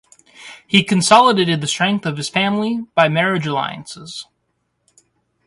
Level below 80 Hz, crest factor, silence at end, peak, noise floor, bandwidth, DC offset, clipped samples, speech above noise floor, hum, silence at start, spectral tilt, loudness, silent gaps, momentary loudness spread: -58 dBFS; 18 dB; 1.25 s; 0 dBFS; -69 dBFS; 11.5 kHz; under 0.1%; under 0.1%; 53 dB; none; 0.4 s; -4 dB/octave; -16 LUFS; none; 21 LU